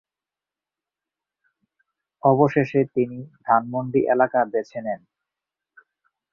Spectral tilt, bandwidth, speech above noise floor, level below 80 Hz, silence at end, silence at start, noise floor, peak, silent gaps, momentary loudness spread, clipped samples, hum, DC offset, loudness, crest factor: -9.5 dB/octave; 6.8 kHz; 69 dB; -66 dBFS; 1.35 s; 2.25 s; -90 dBFS; -2 dBFS; none; 12 LU; under 0.1%; none; under 0.1%; -22 LUFS; 22 dB